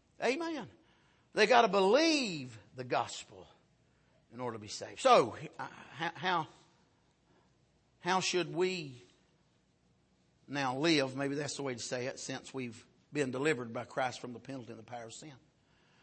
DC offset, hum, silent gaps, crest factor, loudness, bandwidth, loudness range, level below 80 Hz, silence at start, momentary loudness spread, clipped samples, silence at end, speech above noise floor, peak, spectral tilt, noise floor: under 0.1%; none; none; 24 dB; -33 LUFS; 8.8 kHz; 7 LU; -78 dBFS; 0.2 s; 20 LU; under 0.1%; 0.65 s; 38 dB; -12 dBFS; -4 dB/octave; -72 dBFS